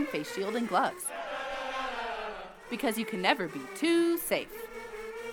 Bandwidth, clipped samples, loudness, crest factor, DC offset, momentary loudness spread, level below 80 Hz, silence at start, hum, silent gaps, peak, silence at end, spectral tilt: 20 kHz; under 0.1%; -32 LUFS; 24 dB; under 0.1%; 14 LU; -60 dBFS; 0 s; none; none; -8 dBFS; 0 s; -3.5 dB/octave